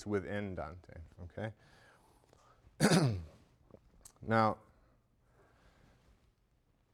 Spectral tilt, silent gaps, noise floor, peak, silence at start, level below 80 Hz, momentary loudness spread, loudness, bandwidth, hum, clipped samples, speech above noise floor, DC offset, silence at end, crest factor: -5.5 dB/octave; none; -73 dBFS; -14 dBFS; 0 s; -62 dBFS; 23 LU; -35 LUFS; 17 kHz; none; under 0.1%; 39 dB; under 0.1%; 2.35 s; 24 dB